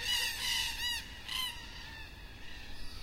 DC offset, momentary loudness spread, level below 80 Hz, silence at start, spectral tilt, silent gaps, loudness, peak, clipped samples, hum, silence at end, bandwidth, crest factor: under 0.1%; 17 LU; -50 dBFS; 0 s; 0 dB/octave; none; -35 LUFS; -20 dBFS; under 0.1%; none; 0 s; 16 kHz; 18 dB